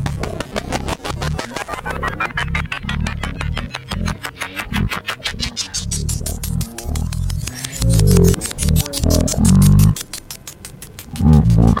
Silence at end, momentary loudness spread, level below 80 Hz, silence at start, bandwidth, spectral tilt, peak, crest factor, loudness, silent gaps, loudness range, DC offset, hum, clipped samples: 0 s; 14 LU; -24 dBFS; 0 s; 17 kHz; -5 dB/octave; -2 dBFS; 16 dB; -18 LUFS; none; 8 LU; under 0.1%; none; under 0.1%